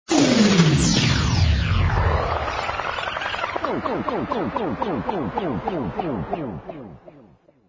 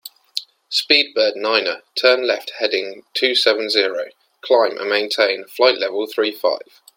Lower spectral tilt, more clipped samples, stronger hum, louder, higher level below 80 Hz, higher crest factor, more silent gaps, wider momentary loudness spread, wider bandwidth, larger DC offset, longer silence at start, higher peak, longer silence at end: first, -5 dB/octave vs -1.5 dB/octave; neither; neither; second, -22 LUFS vs -18 LUFS; first, -30 dBFS vs -70 dBFS; about the same, 18 dB vs 20 dB; neither; about the same, 11 LU vs 13 LU; second, 8 kHz vs 17 kHz; neither; about the same, 0.1 s vs 0.05 s; second, -4 dBFS vs 0 dBFS; about the same, 0.45 s vs 0.4 s